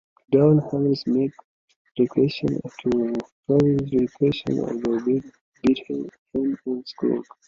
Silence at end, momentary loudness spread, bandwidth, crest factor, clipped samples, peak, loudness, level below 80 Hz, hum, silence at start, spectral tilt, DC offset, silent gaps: 0.25 s; 10 LU; 7.4 kHz; 18 dB; under 0.1%; -6 dBFS; -23 LUFS; -56 dBFS; none; 0.3 s; -8.5 dB/octave; under 0.1%; 1.44-1.68 s, 1.76-1.85 s, 1.91-1.95 s, 3.32-3.43 s, 5.41-5.52 s, 6.18-6.26 s